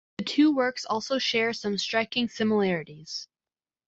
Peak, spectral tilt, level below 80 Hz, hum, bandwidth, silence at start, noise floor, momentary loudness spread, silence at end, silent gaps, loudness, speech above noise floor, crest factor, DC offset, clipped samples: -10 dBFS; -4.5 dB/octave; -68 dBFS; none; 8 kHz; 0.2 s; under -90 dBFS; 13 LU; 0.6 s; none; -26 LUFS; over 64 dB; 16 dB; under 0.1%; under 0.1%